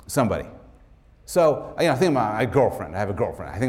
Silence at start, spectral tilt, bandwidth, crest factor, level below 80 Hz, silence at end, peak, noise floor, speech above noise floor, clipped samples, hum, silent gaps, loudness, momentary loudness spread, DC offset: 0.1 s; -6 dB/octave; 16.5 kHz; 16 dB; -48 dBFS; 0 s; -8 dBFS; -52 dBFS; 30 dB; under 0.1%; none; none; -23 LUFS; 8 LU; under 0.1%